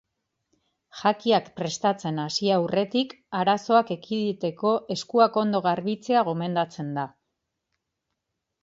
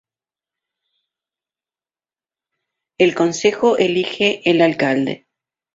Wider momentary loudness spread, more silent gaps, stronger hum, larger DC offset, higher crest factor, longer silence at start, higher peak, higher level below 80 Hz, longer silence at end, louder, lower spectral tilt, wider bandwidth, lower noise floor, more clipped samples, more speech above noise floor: first, 8 LU vs 5 LU; neither; neither; neither; about the same, 20 dB vs 18 dB; second, 0.95 s vs 3 s; second, -6 dBFS vs -2 dBFS; second, -72 dBFS vs -62 dBFS; first, 1.55 s vs 0.6 s; second, -25 LUFS vs -17 LUFS; about the same, -5.5 dB/octave vs -4.5 dB/octave; about the same, 7.8 kHz vs 7.8 kHz; second, -82 dBFS vs under -90 dBFS; neither; second, 58 dB vs over 74 dB